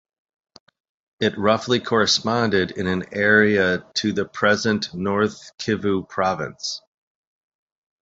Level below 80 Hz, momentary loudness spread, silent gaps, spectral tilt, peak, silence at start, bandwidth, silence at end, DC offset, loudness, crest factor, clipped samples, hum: -52 dBFS; 9 LU; none; -4.5 dB/octave; -2 dBFS; 1.2 s; 8 kHz; 1.2 s; under 0.1%; -21 LUFS; 20 dB; under 0.1%; none